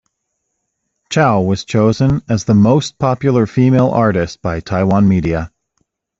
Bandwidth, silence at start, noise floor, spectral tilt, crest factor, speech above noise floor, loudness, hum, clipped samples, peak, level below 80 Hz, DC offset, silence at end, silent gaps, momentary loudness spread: 7.8 kHz; 1.1 s; -72 dBFS; -7 dB/octave; 12 dB; 59 dB; -14 LUFS; none; under 0.1%; -2 dBFS; -40 dBFS; under 0.1%; 0.7 s; none; 8 LU